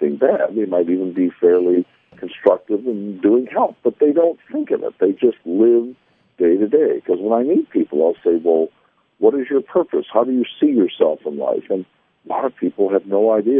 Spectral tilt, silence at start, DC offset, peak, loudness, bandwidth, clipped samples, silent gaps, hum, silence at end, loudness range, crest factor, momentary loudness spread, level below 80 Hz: -10 dB/octave; 0 s; under 0.1%; 0 dBFS; -18 LUFS; 3.7 kHz; under 0.1%; none; none; 0 s; 2 LU; 16 dB; 8 LU; -72 dBFS